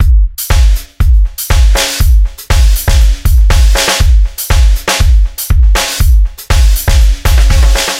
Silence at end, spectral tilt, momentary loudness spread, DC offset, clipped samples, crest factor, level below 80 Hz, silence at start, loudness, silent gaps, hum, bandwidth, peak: 0 s; -3.5 dB/octave; 4 LU; under 0.1%; under 0.1%; 6 dB; -8 dBFS; 0 s; -10 LUFS; none; none; 16.5 kHz; 0 dBFS